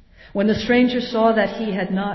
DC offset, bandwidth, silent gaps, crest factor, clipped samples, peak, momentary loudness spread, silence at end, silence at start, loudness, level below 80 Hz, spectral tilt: under 0.1%; 6 kHz; none; 14 dB; under 0.1%; -4 dBFS; 6 LU; 0 s; 0.35 s; -19 LUFS; -48 dBFS; -7 dB/octave